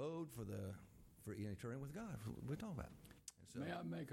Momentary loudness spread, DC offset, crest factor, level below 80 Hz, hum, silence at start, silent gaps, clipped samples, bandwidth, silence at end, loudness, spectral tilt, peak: 11 LU; under 0.1%; 16 dB; -68 dBFS; none; 0 s; none; under 0.1%; 16.5 kHz; 0 s; -51 LUFS; -6.5 dB/octave; -34 dBFS